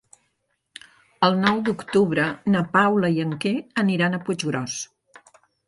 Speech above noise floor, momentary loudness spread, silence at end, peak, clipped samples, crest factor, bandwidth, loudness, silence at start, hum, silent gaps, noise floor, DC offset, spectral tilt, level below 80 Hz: 52 dB; 8 LU; 0.85 s; -2 dBFS; under 0.1%; 22 dB; 11.5 kHz; -22 LUFS; 1.2 s; none; none; -73 dBFS; under 0.1%; -5.5 dB/octave; -62 dBFS